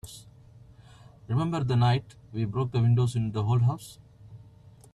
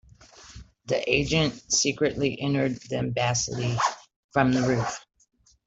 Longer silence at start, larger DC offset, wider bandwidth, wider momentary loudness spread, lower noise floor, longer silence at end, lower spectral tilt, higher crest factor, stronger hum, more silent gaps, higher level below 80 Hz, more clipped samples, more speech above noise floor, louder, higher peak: second, 0.05 s vs 0.4 s; neither; first, 12.5 kHz vs 8.2 kHz; first, 16 LU vs 13 LU; about the same, -53 dBFS vs -51 dBFS; about the same, 0.55 s vs 0.65 s; first, -7.5 dB/octave vs -4 dB/octave; second, 14 dB vs 20 dB; neither; second, none vs 4.16-4.29 s; about the same, -54 dBFS vs -50 dBFS; neither; about the same, 27 dB vs 26 dB; about the same, -27 LUFS vs -25 LUFS; second, -14 dBFS vs -6 dBFS